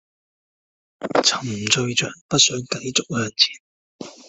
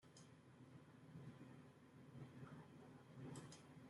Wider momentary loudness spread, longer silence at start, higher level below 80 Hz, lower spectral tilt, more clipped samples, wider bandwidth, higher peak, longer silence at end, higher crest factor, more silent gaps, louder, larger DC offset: first, 11 LU vs 8 LU; first, 1 s vs 0 s; first, -60 dBFS vs -88 dBFS; second, -2 dB/octave vs -6 dB/octave; neither; second, 8.4 kHz vs 11.5 kHz; first, 0 dBFS vs -44 dBFS; first, 0.15 s vs 0 s; first, 24 dB vs 18 dB; first, 2.21-2.29 s, 3.60-3.99 s vs none; first, -19 LUFS vs -61 LUFS; neither